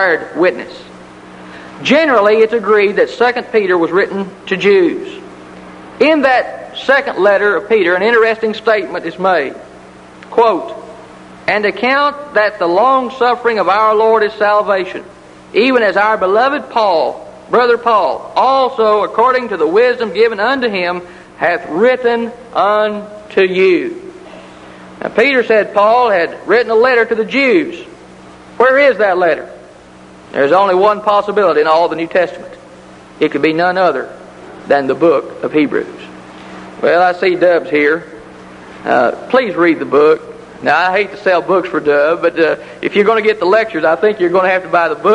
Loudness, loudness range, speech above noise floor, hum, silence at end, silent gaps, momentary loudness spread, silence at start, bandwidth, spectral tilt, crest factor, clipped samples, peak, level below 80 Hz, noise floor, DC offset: -12 LUFS; 3 LU; 26 dB; none; 0 s; none; 13 LU; 0 s; 10 kHz; -5.5 dB/octave; 14 dB; under 0.1%; 0 dBFS; -54 dBFS; -38 dBFS; under 0.1%